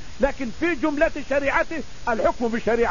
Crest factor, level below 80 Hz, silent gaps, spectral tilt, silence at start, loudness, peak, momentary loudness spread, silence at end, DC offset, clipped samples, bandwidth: 16 dB; -38 dBFS; none; -5 dB/octave; 0 s; -23 LUFS; -6 dBFS; 5 LU; 0 s; 3%; under 0.1%; 7.4 kHz